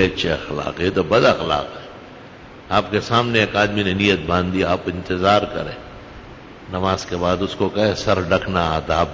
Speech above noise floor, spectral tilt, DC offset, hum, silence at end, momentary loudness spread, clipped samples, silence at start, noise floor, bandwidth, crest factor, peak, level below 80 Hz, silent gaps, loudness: 21 dB; -5.5 dB/octave; under 0.1%; none; 0 s; 22 LU; under 0.1%; 0 s; -40 dBFS; 7.6 kHz; 18 dB; 0 dBFS; -38 dBFS; none; -19 LUFS